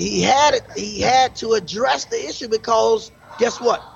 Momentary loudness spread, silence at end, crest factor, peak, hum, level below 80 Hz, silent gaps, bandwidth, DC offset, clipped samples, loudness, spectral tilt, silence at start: 9 LU; 0.05 s; 14 dB; -4 dBFS; none; -48 dBFS; none; 8.4 kHz; under 0.1%; under 0.1%; -19 LUFS; -3 dB/octave; 0 s